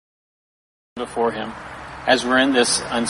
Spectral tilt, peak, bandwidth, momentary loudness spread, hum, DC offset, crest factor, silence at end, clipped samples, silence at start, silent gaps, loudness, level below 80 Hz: -2.5 dB/octave; -2 dBFS; 11.5 kHz; 19 LU; none; under 0.1%; 20 dB; 0 s; under 0.1%; 0.95 s; none; -19 LUFS; -52 dBFS